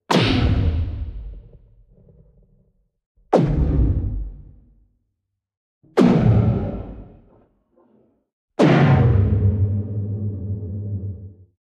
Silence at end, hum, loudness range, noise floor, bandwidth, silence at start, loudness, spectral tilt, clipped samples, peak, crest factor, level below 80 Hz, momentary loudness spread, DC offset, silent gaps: 0.35 s; none; 5 LU; -77 dBFS; 9.2 kHz; 0.1 s; -19 LUFS; -8 dB/octave; under 0.1%; -2 dBFS; 18 dB; -30 dBFS; 19 LU; under 0.1%; 3.06-3.15 s, 5.57-5.81 s, 8.33-8.48 s